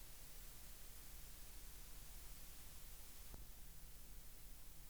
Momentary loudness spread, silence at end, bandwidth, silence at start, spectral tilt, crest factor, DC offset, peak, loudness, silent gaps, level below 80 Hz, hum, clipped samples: 2 LU; 0 s; over 20 kHz; 0 s; -2.5 dB/octave; 18 dB; 0.1%; -38 dBFS; -58 LUFS; none; -60 dBFS; none; under 0.1%